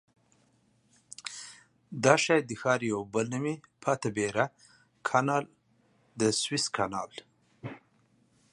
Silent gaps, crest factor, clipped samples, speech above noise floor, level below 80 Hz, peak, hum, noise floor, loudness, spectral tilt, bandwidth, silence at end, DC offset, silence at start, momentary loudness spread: none; 28 dB; under 0.1%; 39 dB; -70 dBFS; -4 dBFS; none; -68 dBFS; -29 LUFS; -4 dB/octave; 11.5 kHz; 0.75 s; under 0.1%; 1.25 s; 20 LU